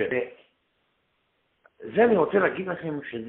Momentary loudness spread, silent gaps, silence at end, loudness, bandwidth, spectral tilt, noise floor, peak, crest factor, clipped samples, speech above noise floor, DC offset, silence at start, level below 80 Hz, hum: 14 LU; none; 0 s; -24 LUFS; 4 kHz; -5 dB/octave; -72 dBFS; -8 dBFS; 20 dB; under 0.1%; 48 dB; under 0.1%; 0 s; -64 dBFS; none